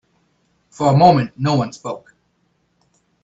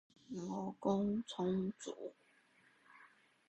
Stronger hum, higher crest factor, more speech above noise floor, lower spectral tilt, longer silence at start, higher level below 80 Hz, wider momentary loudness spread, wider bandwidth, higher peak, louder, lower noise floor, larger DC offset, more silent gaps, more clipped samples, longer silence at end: neither; about the same, 18 dB vs 20 dB; first, 49 dB vs 31 dB; about the same, -7 dB/octave vs -6.5 dB/octave; first, 0.8 s vs 0.3 s; first, -54 dBFS vs -74 dBFS; first, 18 LU vs 14 LU; second, 8 kHz vs 9 kHz; first, 0 dBFS vs -22 dBFS; first, -16 LUFS vs -41 LUFS; second, -65 dBFS vs -71 dBFS; neither; neither; neither; first, 1.25 s vs 0.45 s